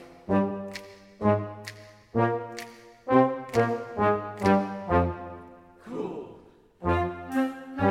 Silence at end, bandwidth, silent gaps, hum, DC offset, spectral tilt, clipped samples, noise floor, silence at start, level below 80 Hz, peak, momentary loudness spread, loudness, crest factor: 0 s; 16 kHz; none; none; under 0.1%; -7.5 dB/octave; under 0.1%; -53 dBFS; 0 s; -50 dBFS; -6 dBFS; 17 LU; -27 LUFS; 22 dB